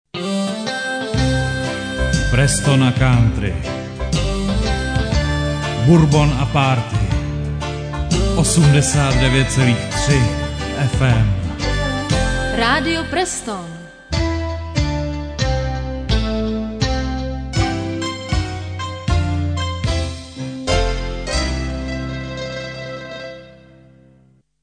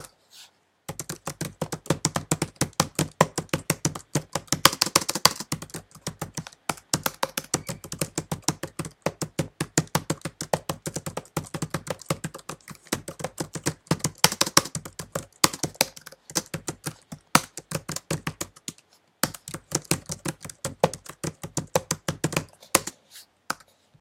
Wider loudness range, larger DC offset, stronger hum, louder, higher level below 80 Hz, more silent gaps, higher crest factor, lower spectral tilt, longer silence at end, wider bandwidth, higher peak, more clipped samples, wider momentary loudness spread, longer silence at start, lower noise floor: about the same, 6 LU vs 6 LU; neither; neither; first, -19 LUFS vs -27 LUFS; first, -26 dBFS vs -56 dBFS; neither; second, 16 dB vs 30 dB; first, -5 dB/octave vs -3 dB/octave; first, 1.1 s vs 0.45 s; second, 10 kHz vs 17 kHz; about the same, -2 dBFS vs 0 dBFS; neither; about the same, 12 LU vs 14 LU; first, 0.15 s vs 0 s; second, -53 dBFS vs -60 dBFS